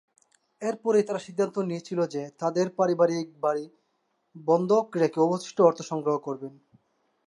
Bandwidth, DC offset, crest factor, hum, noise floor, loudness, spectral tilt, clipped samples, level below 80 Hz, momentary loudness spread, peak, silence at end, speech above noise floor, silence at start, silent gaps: 11 kHz; under 0.1%; 20 dB; none; -74 dBFS; -26 LUFS; -6.5 dB/octave; under 0.1%; -80 dBFS; 11 LU; -6 dBFS; 0.8 s; 49 dB; 0.6 s; none